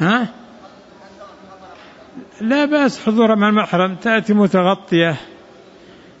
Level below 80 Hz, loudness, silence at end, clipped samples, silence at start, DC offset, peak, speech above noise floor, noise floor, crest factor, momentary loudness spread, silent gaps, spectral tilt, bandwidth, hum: -60 dBFS; -16 LUFS; 0.9 s; under 0.1%; 0 s; under 0.1%; -4 dBFS; 28 dB; -43 dBFS; 14 dB; 6 LU; none; -6.5 dB/octave; 8 kHz; none